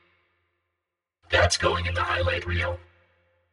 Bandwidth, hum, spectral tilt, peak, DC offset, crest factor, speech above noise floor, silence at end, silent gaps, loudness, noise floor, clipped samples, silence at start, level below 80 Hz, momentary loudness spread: 11.5 kHz; none; -3.5 dB/octave; -8 dBFS; under 0.1%; 20 dB; 59 dB; 0.7 s; none; -24 LUFS; -84 dBFS; under 0.1%; 1.3 s; -42 dBFS; 8 LU